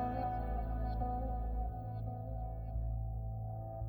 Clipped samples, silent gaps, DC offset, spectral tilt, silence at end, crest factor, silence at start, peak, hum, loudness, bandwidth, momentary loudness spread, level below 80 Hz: under 0.1%; none; under 0.1%; -11 dB/octave; 0 s; 12 dB; 0 s; -26 dBFS; none; -41 LUFS; 4.5 kHz; 5 LU; -40 dBFS